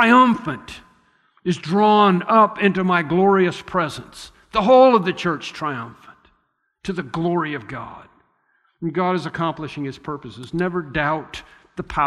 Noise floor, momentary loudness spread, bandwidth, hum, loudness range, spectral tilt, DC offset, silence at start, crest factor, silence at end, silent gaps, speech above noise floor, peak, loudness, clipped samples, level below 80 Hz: -68 dBFS; 20 LU; 12 kHz; none; 10 LU; -6.5 dB/octave; under 0.1%; 0 s; 16 dB; 0 s; none; 50 dB; -2 dBFS; -19 LUFS; under 0.1%; -50 dBFS